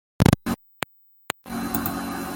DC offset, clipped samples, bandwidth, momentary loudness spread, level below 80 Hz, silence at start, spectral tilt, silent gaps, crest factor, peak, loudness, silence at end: under 0.1%; under 0.1%; 17 kHz; 14 LU; -42 dBFS; 0.2 s; -5.5 dB/octave; none; 24 dB; 0 dBFS; -26 LUFS; 0 s